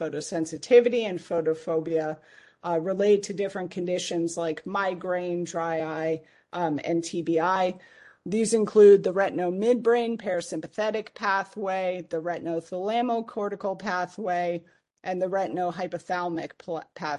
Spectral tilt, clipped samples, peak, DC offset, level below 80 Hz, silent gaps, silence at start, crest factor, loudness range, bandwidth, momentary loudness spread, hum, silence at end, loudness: -5 dB/octave; under 0.1%; -6 dBFS; under 0.1%; -72 dBFS; none; 0 s; 20 dB; 7 LU; 11.5 kHz; 12 LU; none; 0 s; -26 LUFS